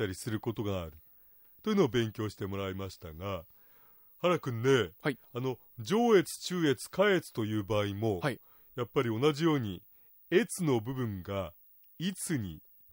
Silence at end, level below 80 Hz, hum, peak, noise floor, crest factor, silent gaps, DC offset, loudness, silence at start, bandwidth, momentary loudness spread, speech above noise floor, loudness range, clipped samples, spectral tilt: 0.35 s; -64 dBFS; none; -14 dBFS; -60 dBFS; 18 dB; none; under 0.1%; -32 LUFS; 0 s; 16 kHz; 13 LU; 28 dB; 5 LU; under 0.1%; -5.5 dB/octave